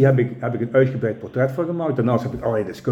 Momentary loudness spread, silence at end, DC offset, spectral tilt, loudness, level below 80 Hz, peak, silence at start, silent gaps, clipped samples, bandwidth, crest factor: 6 LU; 0 s; under 0.1%; -9 dB/octave; -21 LUFS; -52 dBFS; -4 dBFS; 0 s; none; under 0.1%; 7.6 kHz; 16 dB